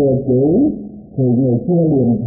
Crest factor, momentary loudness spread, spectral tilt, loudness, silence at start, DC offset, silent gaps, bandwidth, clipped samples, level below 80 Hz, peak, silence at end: 10 dB; 7 LU; -20.5 dB/octave; -15 LUFS; 0 s; under 0.1%; none; 0.9 kHz; under 0.1%; -42 dBFS; -4 dBFS; 0 s